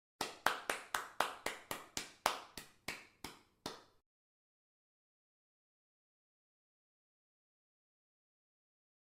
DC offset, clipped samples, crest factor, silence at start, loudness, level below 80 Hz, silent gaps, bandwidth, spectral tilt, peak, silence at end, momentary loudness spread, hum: under 0.1%; under 0.1%; 36 dB; 0.2 s; -42 LUFS; -76 dBFS; none; 16 kHz; -1 dB/octave; -12 dBFS; 5.3 s; 15 LU; none